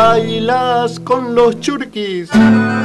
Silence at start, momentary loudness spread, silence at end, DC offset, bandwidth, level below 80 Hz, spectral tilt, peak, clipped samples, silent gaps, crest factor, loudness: 0 s; 10 LU; 0 s; under 0.1%; 11.5 kHz; -44 dBFS; -6 dB/octave; -2 dBFS; under 0.1%; none; 10 dB; -14 LUFS